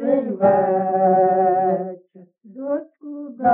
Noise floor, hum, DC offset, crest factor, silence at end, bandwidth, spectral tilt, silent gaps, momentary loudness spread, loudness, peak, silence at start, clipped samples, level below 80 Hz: -48 dBFS; none; under 0.1%; 14 dB; 0 s; 3.3 kHz; -9 dB/octave; none; 17 LU; -19 LUFS; -6 dBFS; 0 s; under 0.1%; -64 dBFS